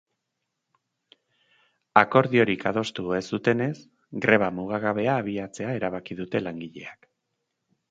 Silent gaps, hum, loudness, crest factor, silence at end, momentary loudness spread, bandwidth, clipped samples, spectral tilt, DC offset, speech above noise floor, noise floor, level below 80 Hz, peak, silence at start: none; none; -25 LUFS; 26 dB; 0.95 s; 17 LU; 9.2 kHz; under 0.1%; -6.5 dB/octave; under 0.1%; 56 dB; -81 dBFS; -62 dBFS; 0 dBFS; 1.95 s